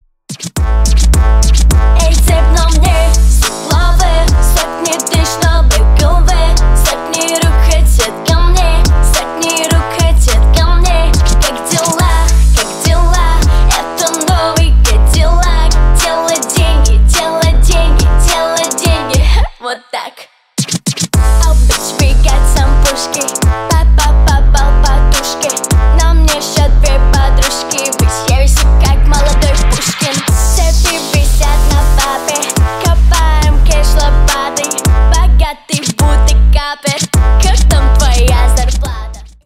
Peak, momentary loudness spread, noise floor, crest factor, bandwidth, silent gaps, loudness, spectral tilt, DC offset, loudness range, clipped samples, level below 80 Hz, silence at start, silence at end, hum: 0 dBFS; 4 LU; -37 dBFS; 8 dB; 16 kHz; none; -11 LUFS; -4 dB/octave; under 0.1%; 1 LU; under 0.1%; -10 dBFS; 0.3 s; 0.15 s; none